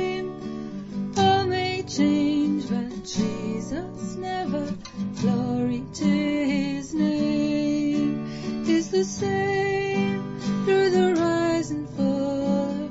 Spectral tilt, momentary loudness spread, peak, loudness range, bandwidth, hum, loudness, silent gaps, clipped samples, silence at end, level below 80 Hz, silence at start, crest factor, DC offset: -6 dB/octave; 10 LU; -8 dBFS; 4 LU; 8 kHz; none; -25 LUFS; none; under 0.1%; 0 s; -52 dBFS; 0 s; 16 dB; under 0.1%